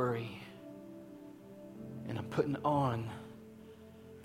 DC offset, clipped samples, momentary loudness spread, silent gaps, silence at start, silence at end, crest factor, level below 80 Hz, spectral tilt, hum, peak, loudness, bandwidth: under 0.1%; under 0.1%; 22 LU; none; 0 s; 0 s; 20 dB; -68 dBFS; -7.5 dB/octave; none; -18 dBFS; -37 LUFS; 16.5 kHz